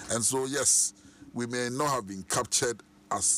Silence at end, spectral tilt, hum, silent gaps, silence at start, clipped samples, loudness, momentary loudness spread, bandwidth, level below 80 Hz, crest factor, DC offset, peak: 0 s; -2 dB/octave; none; none; 0 s; under 0.1%; -27 LUFS; 13 LU; 15.5 kHz; -62 dBFS; 16 dB; under 0.1%; -14 dBFS